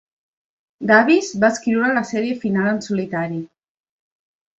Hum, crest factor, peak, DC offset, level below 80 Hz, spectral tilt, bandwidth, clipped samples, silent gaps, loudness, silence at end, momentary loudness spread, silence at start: none; 18 dB; -2 dBFS; under 0.1%; -62 dBFS; -5.5 dB/octave; 8 kHz; under 0.1%; none; -18 LUFS; 1.1 s; 11 LU; 0.8 s